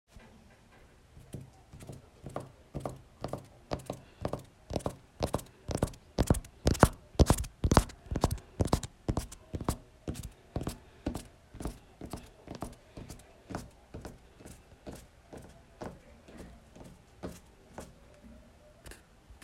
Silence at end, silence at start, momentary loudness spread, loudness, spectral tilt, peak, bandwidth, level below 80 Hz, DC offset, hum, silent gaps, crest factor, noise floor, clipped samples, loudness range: 0.1 s; 0.15 s; 25 LU; -35 LUFS; -5.5 dB/octave; -4 dBFS; 16 kHz; -44 dBFS; under 0.1%; none; none; 32 dB; -59 dBFS; under 0.1%; 20 LU